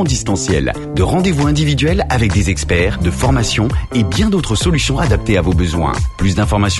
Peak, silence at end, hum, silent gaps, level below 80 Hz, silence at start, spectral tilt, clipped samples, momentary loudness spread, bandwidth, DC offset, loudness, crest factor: -2 dBFS; 0 s; none; none; -22 dBFS; 0 s; -5.5 dB/octave; under 0.1%; 3 LU; 12 kHz; under 0.1%; -15 LUFS; 12 dB